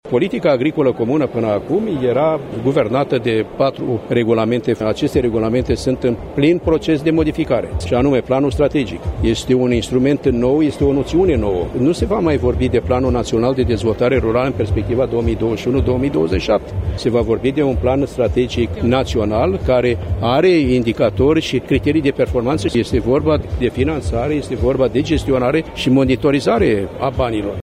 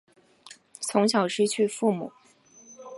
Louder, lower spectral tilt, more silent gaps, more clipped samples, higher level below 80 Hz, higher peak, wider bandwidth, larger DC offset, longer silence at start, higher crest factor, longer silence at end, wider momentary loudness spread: first, -16 LUFS vs -25 LUFS; first, -7 dB/octave vs -4 dB/octave; neither; neither; first, -30 dBFS vs -78 dBFS; first, -2 dBFS vs -8 dBFS; first, 14 kHz vs 11.5 kHz; neither; second, 0.05 s vs 0.45 s; second, 14 dB vs 20 dB; about the same, 0 s vs 0 s; second, 4 LU vs 19 LU